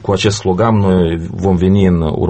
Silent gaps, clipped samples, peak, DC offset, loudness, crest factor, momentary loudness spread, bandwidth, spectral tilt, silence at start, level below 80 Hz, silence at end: none; under 0.1%; 0 dBFS; under 0.1%; -13 LUFS; 12 dB; 5 LU; 8.8 kHz; -6.5 dB/octave; 0 s; -32 dBFS; 0 s